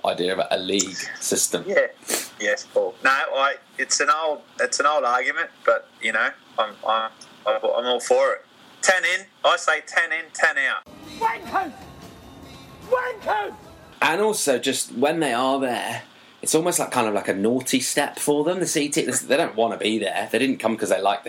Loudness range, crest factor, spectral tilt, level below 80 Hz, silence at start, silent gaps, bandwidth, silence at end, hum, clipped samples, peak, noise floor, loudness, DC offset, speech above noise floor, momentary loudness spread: 4 LU; 18 dB; -2 dB/octave; -64 dBFS; 0.05 s; none; 16.5 kHz; 0 s; none; under 0.1%; -4 dBFS; -43 dBFS; -22 LUFS; under 0.1%; 20 dB; 7 LU